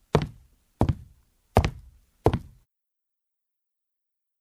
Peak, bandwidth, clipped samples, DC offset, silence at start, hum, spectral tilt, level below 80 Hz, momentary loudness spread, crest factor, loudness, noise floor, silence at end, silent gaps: -2 dBFS; 15 kHz; under 0.1%; under 0.1%; 0.15 s; none; -7.5 dB/octave; -38 dBFS; 10 LU; 28 dB; -28 LUFS; -83 dBFS; 2 s; none